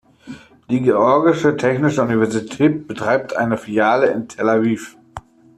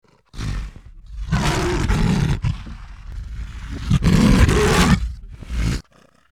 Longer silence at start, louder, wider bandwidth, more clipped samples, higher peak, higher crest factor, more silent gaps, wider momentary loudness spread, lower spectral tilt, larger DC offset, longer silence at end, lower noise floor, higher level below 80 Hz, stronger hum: about the same, 0.25 s vs 0.35 s; about the same, -17 LUFS vs -19 LUFS; second, 13 kHz vs 16.5 kHz; neither; about the same, -2 dBFS vs -4 dBFS; about the same, 16 dB vs 16 dB; neither; about the same, 21 LU vs 22 LU; about the same, -6.5 dB/octave vs -5.5 dB/octave; neither; about the same, 0.4 s vs 0.5 s; second, -38 dBFS vs -54 dBFS; second, -56 dBFS vs -26 dBFS; neither